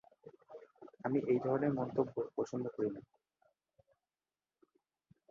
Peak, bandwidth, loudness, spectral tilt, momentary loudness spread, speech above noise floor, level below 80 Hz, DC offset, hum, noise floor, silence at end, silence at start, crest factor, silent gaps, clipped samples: -20 dBFS; 7.2 kHz; -37 LUFS; -8.5 dB/octave; 22 LU; over 54 dB; -78 dBFS; under 0.1%; none; under -90 dBFS; 2.3 s; 0.25 s; 20 dB; none; under 0.1%